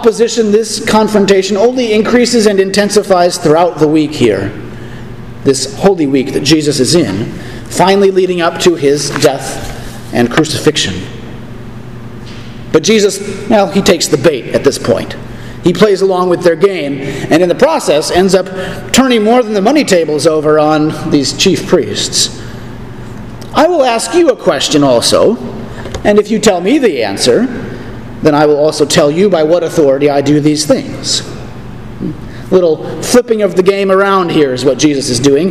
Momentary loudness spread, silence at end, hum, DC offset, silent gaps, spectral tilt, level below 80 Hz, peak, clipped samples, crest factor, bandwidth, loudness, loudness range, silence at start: 17 LU; 0 s; none; 1%; none; -4.5 dB/octave; -36 dBFS; 0 dBFS; 0.7%; 10 dB; 15.5 kHz; -10 LUFS; 3 LU; 0 s